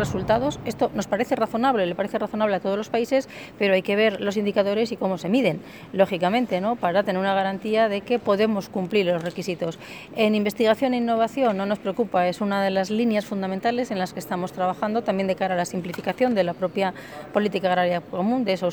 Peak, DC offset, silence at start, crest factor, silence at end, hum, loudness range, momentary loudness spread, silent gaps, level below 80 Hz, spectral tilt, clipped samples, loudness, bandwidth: -6 dBFS; under 0.1%; 0 s; 16 dB; 0 s; none; 2 LU; 7 LU; none; -56 dBFS; -6 dB/octave; under 0.1%; -23 LUFS; over 20 kHz